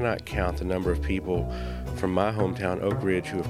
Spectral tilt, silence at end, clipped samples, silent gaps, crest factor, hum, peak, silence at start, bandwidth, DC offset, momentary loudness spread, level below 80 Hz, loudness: -7 dB/octave; 0 s; under 0.1%; none; 20 dB; none; -8 dBFS; 0 s; 15.5 kHz; under 0.1%; 5 LU; -36 dBFS; -28 LUFS